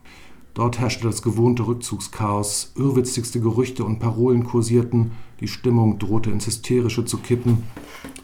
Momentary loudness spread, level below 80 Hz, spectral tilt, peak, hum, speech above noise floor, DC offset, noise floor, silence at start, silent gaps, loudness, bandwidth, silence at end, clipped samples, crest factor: 8 LU; -48 dBFS; -6 dB/octave; -6 dBFS; none; 22 dB; under 0.1%; -43 dBFS; 0.05 s; none; -21 LUFS; 16 kHz; 0.05 s; under 0.1%; 14 dB